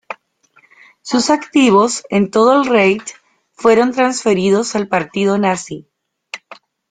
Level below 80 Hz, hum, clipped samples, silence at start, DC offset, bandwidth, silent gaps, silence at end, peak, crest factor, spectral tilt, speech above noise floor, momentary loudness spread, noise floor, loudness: -58 dBFS; none; under 0.1%; 0.1 s; under 0.1%; 9.6 kHz; none; 0.35 s; 0 dBFS; 14 dB; -4.5 dB/octave; 40 dB; 21 LU; -54 dBFS; -14 LUFS